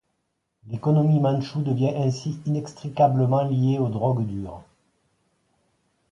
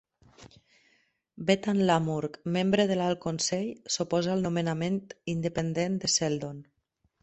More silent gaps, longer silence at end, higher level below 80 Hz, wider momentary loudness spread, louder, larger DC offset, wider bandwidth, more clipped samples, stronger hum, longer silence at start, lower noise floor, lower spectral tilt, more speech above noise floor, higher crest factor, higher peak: neither; first, 1.5 s vs 0.6 s; first, -56 dBFS vs -62 dBFS; first, 13 LU vs 8 LU; first, -23 LUFS vs -28 LUFS; neither; about the same, 7.8 kHz vs 8.4 kHz; neither; neither; first, 0.65 s vs 0.4 s; about the same, -76 dBFS vs -74 dBFS; first, -9 dB/octave vs -4.5 dB/octave; first, 54 dB vs 45 dB; about the same, 18 dB vs 20 dB; first, -6 dBFS vs -10 dBFS